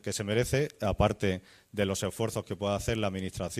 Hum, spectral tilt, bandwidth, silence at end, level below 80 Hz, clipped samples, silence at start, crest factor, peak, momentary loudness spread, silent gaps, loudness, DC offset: none; -5 dB/octave; 15.5 kHz; 0 s; -46 dBFS; under 0.1%; 0.05 s; 20 dB; -10 dBFS; 6 LU; none; -31 LUFS; under 0.1%